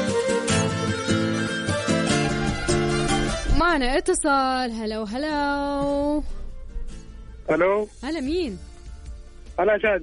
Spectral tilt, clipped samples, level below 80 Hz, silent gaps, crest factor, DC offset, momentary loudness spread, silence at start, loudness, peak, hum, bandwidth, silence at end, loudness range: -4.5 dB/octave; under 0.1%; -34 dBFS; none; 16 dB; under 0.1%; 20 LU; 0 s; -23 LUFS; -8 dBFS; none; 10.5 kHz; 0 s; 5 LU